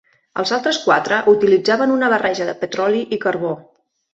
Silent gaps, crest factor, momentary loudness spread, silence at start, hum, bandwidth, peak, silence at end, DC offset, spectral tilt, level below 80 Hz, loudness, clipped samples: none; 16 dB; 10 LU; 0.35 s; none; 8 kHz; -2 dBFS; 0.55 s; under 0.1%; -4.5 dB/octave; -62 dBFS; -17 LUFS; under 0.1%